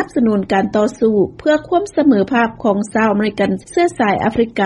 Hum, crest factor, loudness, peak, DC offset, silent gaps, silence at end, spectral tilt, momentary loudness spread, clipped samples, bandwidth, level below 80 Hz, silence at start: none; 14 dB; -15 LUFS; -2 dBFS; under 0.1%; none; 0 s; -6.5 dB/octave; 3 LU; under 0.1%; 11 kHz; -46 dBFS; 0 s